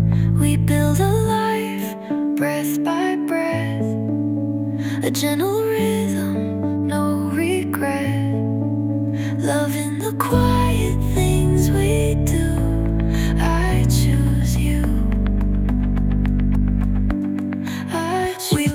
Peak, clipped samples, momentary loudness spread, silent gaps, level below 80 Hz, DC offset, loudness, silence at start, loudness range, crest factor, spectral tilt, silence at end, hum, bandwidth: -4 dBFS; under 0.1%; 5 LU; none; -26 dBFS; under 0.1%; -20 LUFS; 0 s; 3 LU; 16 dB; -6.5 dB/octave; 0 s; none; 17 kHz